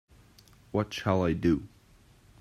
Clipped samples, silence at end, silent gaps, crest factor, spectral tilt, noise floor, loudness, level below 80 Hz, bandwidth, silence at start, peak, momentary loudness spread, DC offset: under 0.1%; 0.75 s; none; 20 dB; -7 dB/octave; -59 dBFS; -29 LUFS; -54 dBFS; 14 kHz; 0.75 s; -12 dBFS; 6 LU; under 0.1%